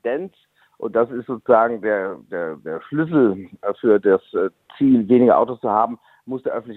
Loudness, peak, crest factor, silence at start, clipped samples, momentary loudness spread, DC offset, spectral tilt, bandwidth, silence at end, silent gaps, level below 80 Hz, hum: -19 LUFS; -2 dBFS; 18 dB; 0.05 s; under 0.1%; 13 LU; under 0.1%; -10 dB/octave; 4.1 kHz; 0 s; none; -64 dBFS; none